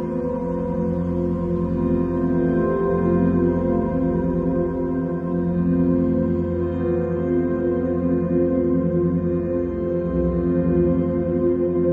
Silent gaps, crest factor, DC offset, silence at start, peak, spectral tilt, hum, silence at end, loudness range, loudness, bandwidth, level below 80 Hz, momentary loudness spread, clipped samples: none; 12 dB; under 0.1%; 0 s; -8 dBFS; -12 dB/octave; none; 0 s; 1 LU; -21 LUFS; 3.3 kHz; -38 dBFS; 5 LU; under 0.1%